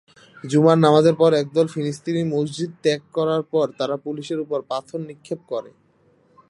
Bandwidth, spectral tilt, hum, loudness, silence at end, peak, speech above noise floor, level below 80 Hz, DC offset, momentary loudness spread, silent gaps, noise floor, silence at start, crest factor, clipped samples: 11.5 kHz; -6.5 dB/octave; none; -21 LUFS; 0.8 s; -2 dBFS; 39 dB; -68 dBFS; under 0.1%; 16 LU; none; -59 dBFS; 0.45 s; 20 dB; under 0.1%